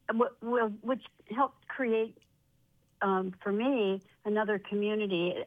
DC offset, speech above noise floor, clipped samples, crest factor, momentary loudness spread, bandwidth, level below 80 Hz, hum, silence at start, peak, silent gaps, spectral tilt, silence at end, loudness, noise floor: under 0.1%; 38 dB; under 0.1%; 18 dB; 6 LU; 4.9 kHz; -76 dBFS; none; 0.1 s; -14 dBFS; none; -8 dB/octave; 0 s; -32 LUFS; -69 dBFS